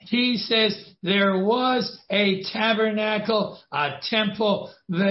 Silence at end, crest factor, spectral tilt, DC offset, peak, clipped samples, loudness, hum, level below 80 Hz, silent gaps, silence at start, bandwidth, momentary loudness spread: 0 s; 16 dB; -8 dB/octave; under 0.1%; -8 dBFS; under 0.1%; -23 LUFS; none; -68 dBFS; none; 0.05 s; 6 kHz; 6 LU